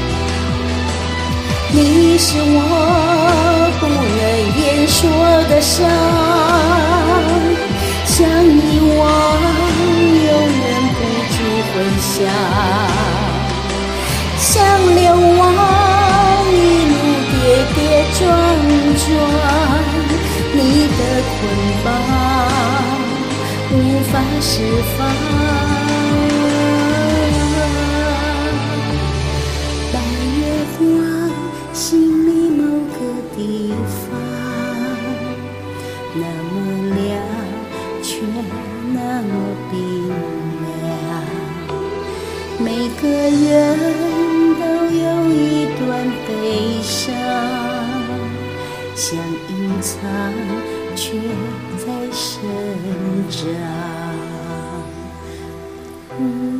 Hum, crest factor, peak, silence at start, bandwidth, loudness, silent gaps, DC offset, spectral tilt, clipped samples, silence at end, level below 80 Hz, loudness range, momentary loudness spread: none; 14 dB; 0 dBFS; 0 s; 15.5 kHz; -15 LUFS; none; 0.2%; -5 dB/octave; under 0.1%; 0 s; -28 dBFS; 11 LU; 13 LU